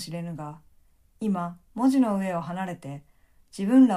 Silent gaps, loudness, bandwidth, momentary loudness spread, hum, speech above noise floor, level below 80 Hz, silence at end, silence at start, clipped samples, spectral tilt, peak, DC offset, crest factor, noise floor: none; -26 LUFS; 12.5 kHz; 19 LU; none; 35 dB; -62 dBFS; 0 s; 0 s; under 0.1%; -7 dB/octave; -8 dBFS; under 0.1%; 18 dB; -59 dBFS